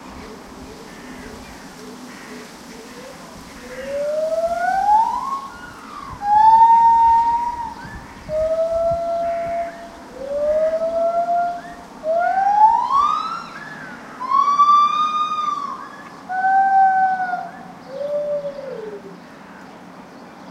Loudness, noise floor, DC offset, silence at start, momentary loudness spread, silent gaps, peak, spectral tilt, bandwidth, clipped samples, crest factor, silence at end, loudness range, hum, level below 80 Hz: -18 LUFS; -39 dBFS; under 0.1%; 0 s; 23 LU; none; -2 dBFS; -4 dB/octave; 13.5 kHz; under 0.1%; 16 dB; 0 s; 13 LU; none; -50 dBFS